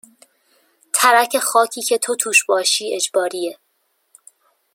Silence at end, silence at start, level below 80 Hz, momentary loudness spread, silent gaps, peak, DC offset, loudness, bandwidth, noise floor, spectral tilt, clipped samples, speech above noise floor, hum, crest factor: 1.2 s; 0.95 s; -78 dBFS; 9 LU; none; 0 dBFS; under 0.1%; -17 LUFS; 16.5 kHz; -67 dBFS; 0.5 dB/octave; under 0.1%; 50 dB; none; 20 dB